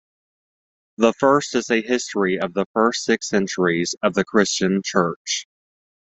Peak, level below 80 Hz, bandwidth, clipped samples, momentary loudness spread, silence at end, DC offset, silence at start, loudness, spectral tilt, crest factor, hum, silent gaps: -2 dBFS; -60 dBFS; 8.4 kHz; under 0.1%; 5 LU; 0.55 s; under 0.1%; 1 s; -20 LUFS; -4 dB/octave; 20 dB; none; 2.66-2.74 s, 5.16-5.25 s